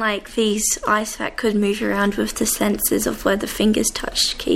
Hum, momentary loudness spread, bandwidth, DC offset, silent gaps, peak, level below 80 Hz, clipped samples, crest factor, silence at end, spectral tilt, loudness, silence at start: none; 3 LU; 16.5 kHz; under 0.1%; none; -4 dBFS; -40 dBFS; under 0.1%; 16 dB; 0 s; -3 dB/octave; -20 LUFS; 0 s